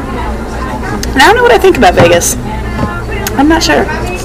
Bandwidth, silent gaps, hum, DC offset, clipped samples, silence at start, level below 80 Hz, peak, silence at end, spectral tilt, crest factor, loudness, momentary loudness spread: 16 kHz; none; none; under 0.1%; 2%; 0 s; -20 dBFS; 0 dBFS; 0 s; -4 dB/octave; 10 dB; -9 LUFS; 12 LU